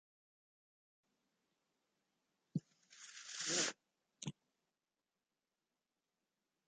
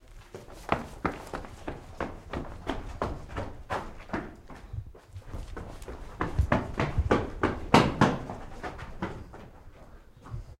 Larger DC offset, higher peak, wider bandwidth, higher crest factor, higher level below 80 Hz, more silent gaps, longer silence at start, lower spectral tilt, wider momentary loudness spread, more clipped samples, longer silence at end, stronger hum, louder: neither; second, -24 dBFS vs -4 dBFS; second, 9.4 kHz vs 15.5 kHz; about the same, 28 dB vs 28 dB; second, -88 dBFS vs -40 dBFS; neither; first, 2.55 s vs 0.1 s; second, -2 dB/octave vs -6 dB/octave; about the same, 19 LU vs 19 LU; neither; first, 2.35 s vs 0.05 s; neither; second, -43 LUFS vs -31 LUFS